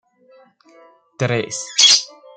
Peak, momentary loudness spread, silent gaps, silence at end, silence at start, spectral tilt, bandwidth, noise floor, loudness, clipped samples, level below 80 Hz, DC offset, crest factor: 0 dBFS; 12 LU; none; 0.3 s; 1.2 s; -1.5 dB/octave; 12 kHz; -51 dBFS; -14 LUFS; under 0.1%; -66 dBFS; under 0.1%; 20 dB